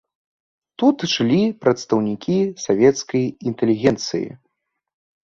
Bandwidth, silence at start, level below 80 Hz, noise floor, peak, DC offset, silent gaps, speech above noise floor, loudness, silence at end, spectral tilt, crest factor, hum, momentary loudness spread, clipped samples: 7.6 kHz; 0.8 s; -56 dBFS; -74 dBFS; -2 dBFS; under 0.1%; none; 55 dB; -19 LUFS; 0.9 s; -5.5 dB/octave; 18 dB; none; 8 LU; under 0.1%